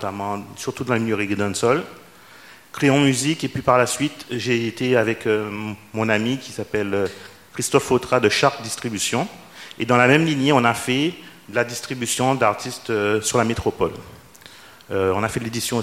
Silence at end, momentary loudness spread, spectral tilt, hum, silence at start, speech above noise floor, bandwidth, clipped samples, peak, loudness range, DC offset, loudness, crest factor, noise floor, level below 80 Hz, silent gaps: 0 s; 12 LU; -4.5 dB/octave; none; 0 s; 25 dB; 16.5 kHz; under 0.1%; 0 dBFS; 3 LU; 0.1%; -21 LUFS; 22 dB; -46 dBFS; -52 dBFS; none